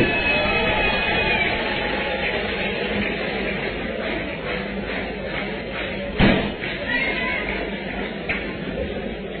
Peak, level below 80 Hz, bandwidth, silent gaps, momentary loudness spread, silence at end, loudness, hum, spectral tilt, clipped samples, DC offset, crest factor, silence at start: -6 dBFS; -36 dBFS; 4.6 kHz; none; 9 LU; 0 s; -23 LUFS; none; -8.5 dB/octave; under 0.1%; under 0.1%; 18 dB; 0 s